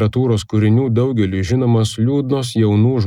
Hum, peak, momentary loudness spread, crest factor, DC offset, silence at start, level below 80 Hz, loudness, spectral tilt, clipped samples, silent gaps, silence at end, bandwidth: none; -4 dBFS; 4 LU; 12 dB; 0.1%; 0 s; -48 dBFS; -16 LUFS; -7.5 dB/octave; under 0.1%; none; 0 s; 11.5 kHz